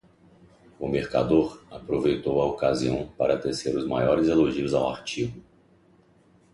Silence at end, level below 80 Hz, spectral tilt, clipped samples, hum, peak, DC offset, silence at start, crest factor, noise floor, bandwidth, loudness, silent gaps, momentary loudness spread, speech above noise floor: 1.15 s; -50 dBFS; -6.5 dB/octave; under 0.1%; none; -8 dBFS; under 0.1%; 0.8 s; 18 dB; -59 dBFS; 11.5 kHz; -25 LUFS; none; 9 LU; 35 dB